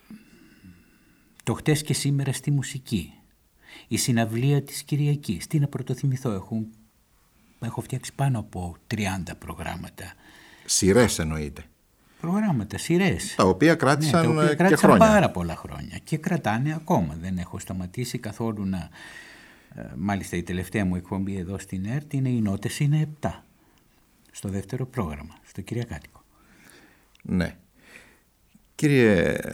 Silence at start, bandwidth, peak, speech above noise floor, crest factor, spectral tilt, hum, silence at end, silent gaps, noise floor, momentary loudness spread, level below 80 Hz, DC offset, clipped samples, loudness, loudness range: 0.1 s; 17 kHz; -4 dBFS; 38 dB; 22 dB; -5.5 dB/octave; none; 0 s; none; -62 dBFS; 18 LU; -50 dBFS; under 0.1%; under 0.1%; -25 LUFS; 13 LU